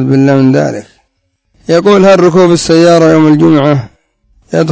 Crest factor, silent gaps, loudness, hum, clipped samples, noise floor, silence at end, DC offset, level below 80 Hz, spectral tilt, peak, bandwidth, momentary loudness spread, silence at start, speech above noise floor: 8 dB; none; -7 LUFS; none; 2%; -61 dBFS; 0 s; under 0.1%; -44 dBFS; -6.5 dB/octave; 0 dBFS; 8 kHz; 11 LU; 0 s; 55 dB